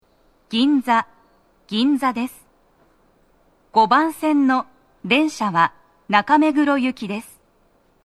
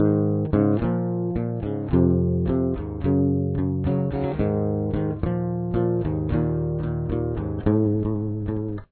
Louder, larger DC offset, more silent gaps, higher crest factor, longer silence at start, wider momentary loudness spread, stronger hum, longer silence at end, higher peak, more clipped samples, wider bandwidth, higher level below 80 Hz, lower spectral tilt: first, -19 LUFS vs -24 LUFS; neither; neither; about the same, 20 dB vs 16 dB; first, 0.5 s vs 0 s; first, 13 LU vs 6 LU; neither; first, 0.85 s vs 0.1 s; first, 0 dBFS vs -8 dBFS; neither; first, 13.5 kHz vs 4.4 kHz; second, -62 dBFS vs -38 dBFS; second, -5 dB/octave vs -13.5 dB/octave